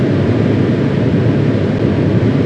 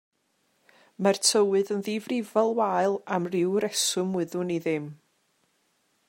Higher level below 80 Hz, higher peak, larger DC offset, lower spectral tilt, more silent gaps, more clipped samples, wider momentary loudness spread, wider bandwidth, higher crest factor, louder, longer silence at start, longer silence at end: first, -36 dBFS vs -78 dBFS; first, 0 dBFS vs -6 dBFS; neither; first, -9 dB/octave vs -3.5 dB/octave; neither; neither; second, 1 LU vs 8 LU; second, 8 kHz vs 16 kHz; second, 12 dB vs 22 dB; first, -14 LUFS vs -26 LUFS; second, 0 s vs 1 s; second, 0 s vs 1.15 s